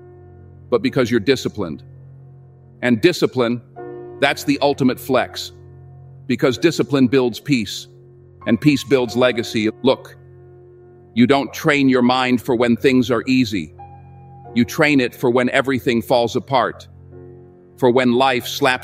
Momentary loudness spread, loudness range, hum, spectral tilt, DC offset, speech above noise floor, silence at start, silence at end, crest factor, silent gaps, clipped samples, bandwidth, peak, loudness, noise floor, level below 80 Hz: 12 LU; 3 LU; none; -5.5 dB/octave; under 0.1%; 27 dB; 0.7 s; 0 s; 18 dB; none; under 0.1%; 16 kHz; 0 dBFS; -18 LUFS; -44 dBFS; -56 dBFS